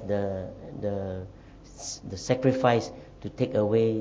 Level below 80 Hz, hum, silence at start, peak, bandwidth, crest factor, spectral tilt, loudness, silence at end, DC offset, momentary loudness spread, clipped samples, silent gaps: -52 dBFS; none; 0 s; -8 dBFS; 8 kHz; 20 dB; -6 dB/octave; -28 LUFS; 0 s; under 0.1%; 16 LU; under 0.1%; none